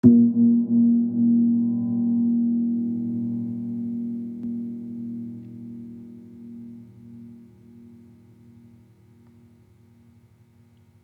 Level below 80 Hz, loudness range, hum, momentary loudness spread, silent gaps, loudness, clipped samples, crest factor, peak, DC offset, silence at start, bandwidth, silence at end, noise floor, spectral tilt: -72 dBFS; 24 LU; none; 24 LU; none; -23 LUFS; under 0.1%; 20 dB; -4 dBFS; under 0.1%; 0.05 s; 1.1 kHz; 3.7 s; -55 dBFS; -12.5 dB/octave